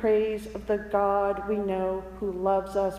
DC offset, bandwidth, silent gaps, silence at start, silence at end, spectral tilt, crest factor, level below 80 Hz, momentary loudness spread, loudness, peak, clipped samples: under 0.1%; 14.5 kHz; none; 0 s; 0 s; -7 dB/octave; 14 dB; -48 dBFS; 7 LU; -28 LUFS; -12 dBFS; under 0.1%